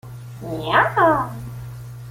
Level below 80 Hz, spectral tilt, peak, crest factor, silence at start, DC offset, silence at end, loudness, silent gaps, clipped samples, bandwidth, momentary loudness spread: -48 dBFS; -6 dB/octave; -2 dBFS; 20 dB; 0.05 s; under 0.1%; 0 s; -18 LUFS; none; under 0.1%; 16.5 kHz; 19 LU